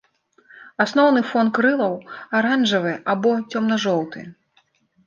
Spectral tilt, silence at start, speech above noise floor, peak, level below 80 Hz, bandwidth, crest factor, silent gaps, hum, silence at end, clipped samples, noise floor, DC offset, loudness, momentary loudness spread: -5 dB/octave; 0.6 s; 43 dB; -4 dBFS; -70 dBFS; 7.4 kHz; 16 dB; none; none; 0.75 s; under 0.1%; -63 dBFS; under 0.1%; -20 LUFS; 10 LU